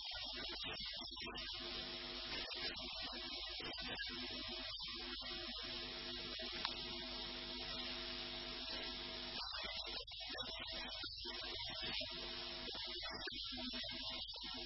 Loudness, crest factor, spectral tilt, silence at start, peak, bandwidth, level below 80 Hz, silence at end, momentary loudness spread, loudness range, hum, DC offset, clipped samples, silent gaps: -45 LUFS; 26 dB; 0 dB/octave; 0 s; -20 dBFS; 5.8 kHz; -62 dBFS; 0 s; 2 LU; 1 LU; none; under 0.1%; under 0.1%; none